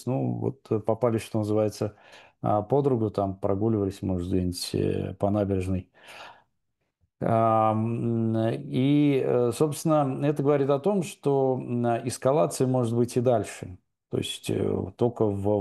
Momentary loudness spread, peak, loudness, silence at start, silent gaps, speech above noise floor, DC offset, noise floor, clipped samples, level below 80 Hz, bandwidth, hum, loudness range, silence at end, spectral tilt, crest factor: 9 LU; -10 dBFS; -26 LUFS; 0 s; none; 53 dB; under 0.1%; -79 dBFS; under 0.1%; -60 dBFS; 12.5 kHz; none; 4 LU; 0 s; -7 dB/octave; 16 dB